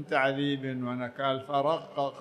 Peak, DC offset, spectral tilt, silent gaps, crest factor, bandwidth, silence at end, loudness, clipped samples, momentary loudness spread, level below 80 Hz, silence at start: -12 dBFS; under 0.1%; -6.5 dB/octave; none; 18 dB; 10.5 kHz; 0 s; -30 LUFS; under 0.1%; 6 LU; -76 dBFS; 0 s